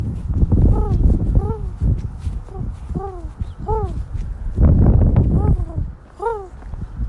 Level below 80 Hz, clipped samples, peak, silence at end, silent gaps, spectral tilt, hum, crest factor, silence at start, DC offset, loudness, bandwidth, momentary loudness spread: -20 dBFS; under 0.1%; -4 dBFS; 0 s; none; -11 dB/octave; none; 14 dB; 0 s; under 0.1%; -20 LUFS; 3.2 kHz; 16 LU